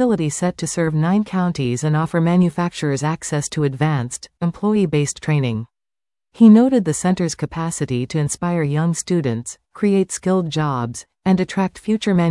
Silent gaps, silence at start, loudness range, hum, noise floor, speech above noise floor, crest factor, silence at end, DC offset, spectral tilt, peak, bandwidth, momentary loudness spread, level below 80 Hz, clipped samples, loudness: none; 0 s; 4 LU; none; under -90 dBFS; over 72 dB; 16 dB; 0 s; under 0.1%; -6 dB/octave; -2 dBFS; 12 kHz; 8 LU; -52 dBFS; under 0.1%; -19 LUFS